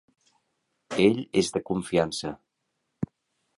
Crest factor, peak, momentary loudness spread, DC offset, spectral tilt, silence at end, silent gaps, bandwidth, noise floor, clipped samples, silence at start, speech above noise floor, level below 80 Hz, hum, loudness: 22 dB; -8 dBFS; 14 LU; under 0.1%; -5 dB/octave; 0.55 s; none; 11.5 kHz; -79 dBFS; under 0.1%; 0.9 s; 54 dB; -58 dBFS; none; -27 LUFS